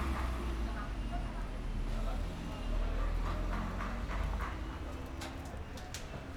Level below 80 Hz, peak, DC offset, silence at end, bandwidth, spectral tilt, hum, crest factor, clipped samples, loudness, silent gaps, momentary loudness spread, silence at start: -38 dBFS; -24 dBFS; under 0.1%; 0 s; 14 kHz; -6 dB/octave; none; 12 dB; under 0.1%; -40 LUFS; none; 6 LU; 0 s